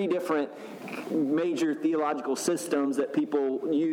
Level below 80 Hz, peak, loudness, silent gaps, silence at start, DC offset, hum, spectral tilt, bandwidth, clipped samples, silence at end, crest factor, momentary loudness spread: -82 dBFS; -14 dBFS; -28 LUFS; none; 0 s; under 0.1%; none; -5 dB/octave; 16.5 kHz; under 0.1%; 0 s; 14 dB; 7 LU